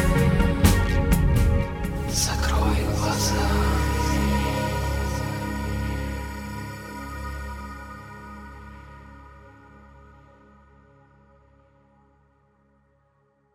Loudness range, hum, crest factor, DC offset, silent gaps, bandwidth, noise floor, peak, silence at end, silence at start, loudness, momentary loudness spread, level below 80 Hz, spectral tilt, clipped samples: 20 LU; none; 20 dB; under 0.1%; none; 17 kHz; -65 dBFS; -4 dBFS; 4.05 s; 0 s; -24 LUFS; 20 LU; -30 dBFS; -5 dB/octave; under 0.1%